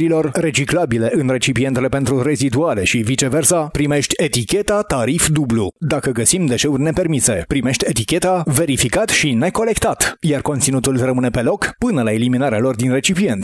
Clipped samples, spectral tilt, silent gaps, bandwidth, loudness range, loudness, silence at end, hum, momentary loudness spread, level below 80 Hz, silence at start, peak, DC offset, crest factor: under 0.1%; -4.5 dB/octave; none; 12 kHz; 1 LU; -16 LUFS; 0 s; none; 3 LU; -38 dBFS; 0 s; 0 dBFS; under 0.1%; 16 dB